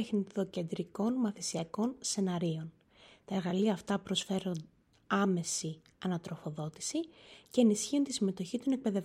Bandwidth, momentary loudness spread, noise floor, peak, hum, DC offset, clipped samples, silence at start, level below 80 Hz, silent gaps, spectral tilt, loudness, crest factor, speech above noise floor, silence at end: 14 kHz; 10 LU; -59 dBFS; -16 dBFS; none; under 0.1%; under 0.1%; 0 s; -72 dBFS; none; -5 dB/octave; -34 LUFS; 18 dB; 26 dB; 0 s